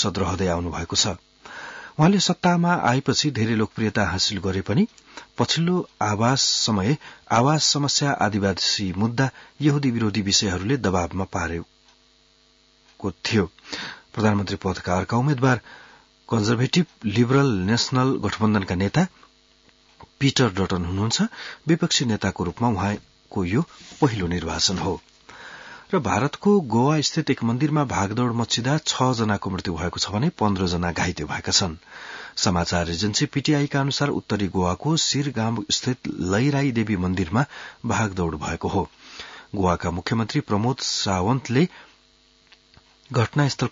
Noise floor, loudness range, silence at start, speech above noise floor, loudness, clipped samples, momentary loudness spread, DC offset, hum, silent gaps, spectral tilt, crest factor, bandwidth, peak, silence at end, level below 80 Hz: -59 dBFS; 4 LU; 0 s; 36 dB; -22 LUFS; under 0.1%; 9 LU; under 0.1%; none; none; -4.5 dB/octave; 18 dB; 7.8 kHz; -6 dBFS; 0 s; -52 dBFS